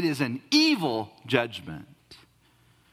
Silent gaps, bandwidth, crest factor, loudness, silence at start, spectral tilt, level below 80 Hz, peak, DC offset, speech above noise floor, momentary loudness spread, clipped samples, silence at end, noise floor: none; 15.5 kHz; 24 dB; -25 LUFS; 0 s; -4.5 dB/octave; -66 dBFS; -4 dBFS; under 0.1%; 36 dB; 19 LU; under 0.1%; 0.75 s; -62 dBFS